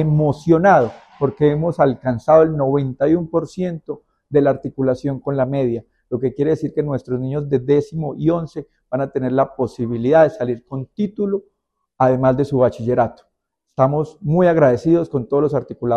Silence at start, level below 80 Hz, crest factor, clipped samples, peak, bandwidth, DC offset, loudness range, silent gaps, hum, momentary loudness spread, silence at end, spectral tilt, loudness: 0 s; -50 dBFS; 18 dB; under 0.1%; 0 dBFS; 8.6 kHz; under 0.1%; 4 LU; none; none; 11 LU; 0 s; -9 dB/octave; -18 LUFS